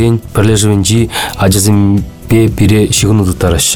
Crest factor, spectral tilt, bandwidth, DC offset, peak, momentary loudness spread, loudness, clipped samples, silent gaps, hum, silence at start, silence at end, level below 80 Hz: 8 dB; -5 dB/octave; 19.5 kHz; 2%; 0 dBFS; 4 LU; -10 LUFS; under 0.1%; none; none; 0 s; 0 s; -26 dBFS